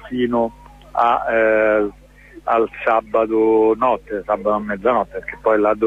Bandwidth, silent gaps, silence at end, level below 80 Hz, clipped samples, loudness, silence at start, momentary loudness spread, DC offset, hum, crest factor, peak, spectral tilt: 7.2 kHz; none; 0 s; -46 dBFS; under 0.1%; -18 LUFS; 0 s; 8 LU; under 0.1%; none; 14 dB; -4 dBFS; -7.5 dB/octave